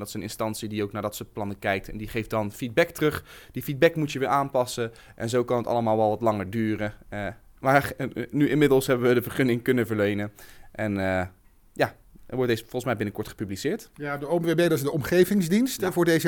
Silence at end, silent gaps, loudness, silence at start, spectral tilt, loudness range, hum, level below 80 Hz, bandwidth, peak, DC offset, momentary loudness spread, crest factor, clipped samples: 0 s; none; -26 LUFS; 0 s; -6 dB/octave; 5 LU; none; -52 dBFS; 18 kHz; -6 dBFS; under 0.1%; 12 LU; 20 dB; under 0.1%